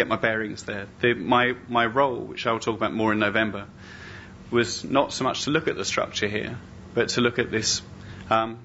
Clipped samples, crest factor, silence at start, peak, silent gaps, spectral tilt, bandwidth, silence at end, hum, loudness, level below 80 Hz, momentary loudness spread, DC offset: under 0.1%; 20 dB; 0 s; -6 dBFS; none; -3 dB/octave; 8 kHz; 0 s; none; -24 LUFS; -54 dBFS; 18 LU; under 0.1%